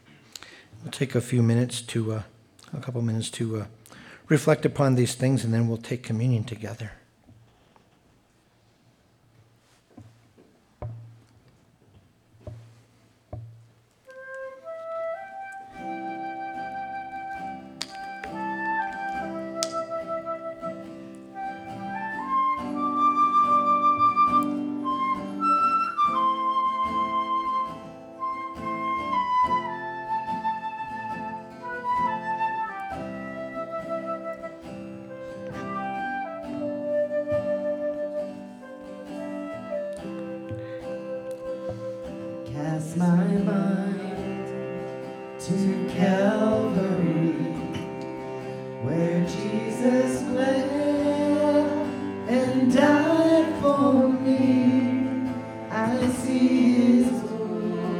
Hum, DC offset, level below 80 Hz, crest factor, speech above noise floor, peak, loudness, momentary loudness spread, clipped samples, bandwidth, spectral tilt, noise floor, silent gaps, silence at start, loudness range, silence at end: none; under 0.1%; -60 dBFS; 24 dB; 37 dB; -2 dBFS; -26 LUFS; 18 LU; under 0.1%; 14.5 kHz; -6.5 dB/octave; -62 dBFS; none; 0.4 s; 13 LU; 0 s